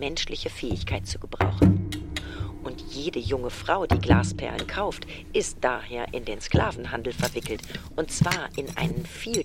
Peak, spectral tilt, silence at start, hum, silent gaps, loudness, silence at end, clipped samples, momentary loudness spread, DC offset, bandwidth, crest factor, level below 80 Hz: -4 dBFS; -5 dB/octave; 0 s; none; none; -27 LUFS; 0 s; under 0.1%; 13 LU; under 0.1%; 16.5 kHz; 22 dB; -38 dBFS